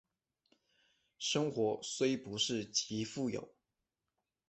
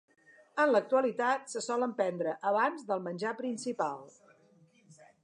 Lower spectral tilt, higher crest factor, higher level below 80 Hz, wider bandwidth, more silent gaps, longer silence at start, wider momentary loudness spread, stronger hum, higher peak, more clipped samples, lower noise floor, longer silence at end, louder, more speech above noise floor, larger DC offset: about the same, -3.5 dB/octave vs -4.5 dB/octave; about the same, 18 dB vs 18 dB; first, -74 dBFS vs -90 dBFS; second, 8.4 kHz vs 11 kHz; neither; first, 1.2 s vs 0.55 s; second, 6 LU vs 9 LU; neither; second, -20 dBFS vs -14 dBFS; neither; first, -89 dBFS vs -64 dBFS; first, 1 s vs 0.3 s; second, -36 LUFS vs -32 LUFS; first, 52 dB vs 33 dB; neither